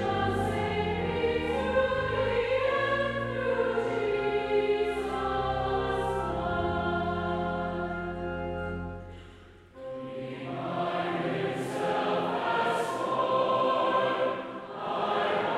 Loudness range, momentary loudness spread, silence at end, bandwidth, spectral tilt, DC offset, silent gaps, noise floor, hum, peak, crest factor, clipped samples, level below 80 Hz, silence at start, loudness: 7 LU; 10 LU; 0 s; 13 kHz; -6 dB/octave; under 0.1%; none; -51 dBFS; none; -14 dBFS; 14 dB; under 0.1%; -50 dBFS; 0 s; -29 LUFS